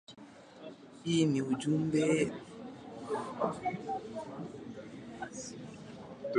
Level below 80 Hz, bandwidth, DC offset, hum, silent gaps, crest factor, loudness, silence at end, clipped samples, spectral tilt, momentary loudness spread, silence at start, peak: -70 dBFS; 11 kHz; under 0.1%; none; none; 20 dB; -34 LUFS; 0 s; under 0.1%; -6 dB/octave; 21 LU; 0.1 s; -16 dBFS